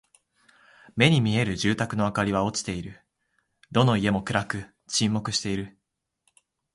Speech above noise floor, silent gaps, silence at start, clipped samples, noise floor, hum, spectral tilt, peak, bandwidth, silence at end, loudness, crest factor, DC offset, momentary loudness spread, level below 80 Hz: 56 dB; none; 0.95 s; under 0.1%; -80 dBFS; none; -5 dB/octave; -6 dBFS; 11.5 kHz; 1.05 s; -25 LUFS; 22 dB; under 0.1%; 13 LU; -52 dBFS